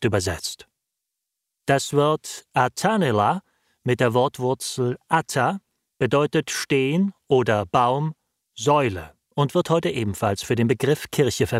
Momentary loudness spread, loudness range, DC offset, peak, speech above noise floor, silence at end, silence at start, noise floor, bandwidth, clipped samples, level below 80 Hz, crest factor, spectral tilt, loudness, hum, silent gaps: 8 LU; 2 LU; under 0.1%; -4 dBFS; 61 dB; 0 s; 0 s; -82 dBFS; 16 kHz; under 0.1%; -54 dBFS; 18 dB; -5 dB/octave; -22 LUFS; none; none